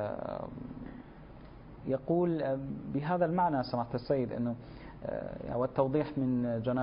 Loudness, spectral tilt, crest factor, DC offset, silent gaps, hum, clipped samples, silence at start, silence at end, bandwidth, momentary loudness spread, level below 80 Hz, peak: -33 LUFS; -7.5 dB/octave; 18 dB; under 0.1%; none; none; under 0.1%; 0 s; 0 s; 5.2 kHz; 18 LU; -56 dBFS; -14 dBFS